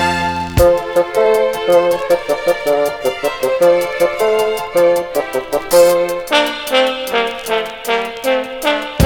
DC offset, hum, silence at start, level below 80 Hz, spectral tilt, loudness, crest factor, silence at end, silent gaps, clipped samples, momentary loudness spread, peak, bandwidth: under 0.1%; none; 0 s; -36 dBFS; -4 dB/octave; -15 LUFS; 14 dB; 0 s; none; under 0.1%; 6 LU; 0 dBFS; 19.5 kHz